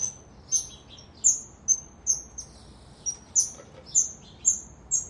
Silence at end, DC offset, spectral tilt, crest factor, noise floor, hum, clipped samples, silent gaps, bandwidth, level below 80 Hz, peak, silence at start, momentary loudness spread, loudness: 0 s; under 0.1%; 0 dB/octave; 22 dB; -49 dBFS; none; under 0.1%; none; 11.5 kHz; -56 dBFS; -8 dBFS; 0 s; 18 LU; -25 LUFS